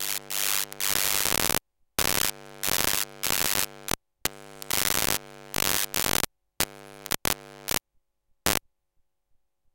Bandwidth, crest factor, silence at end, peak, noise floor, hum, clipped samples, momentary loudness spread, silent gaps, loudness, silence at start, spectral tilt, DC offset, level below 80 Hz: 17.5 kHz; 28 dB; 1.15 s; -2 dBFS; -71 dBFS; none; under 0.1%; 9 LU; none; -26 LUFS; 0 s; -1 dB/octave; under 0.1%; -50 dBFS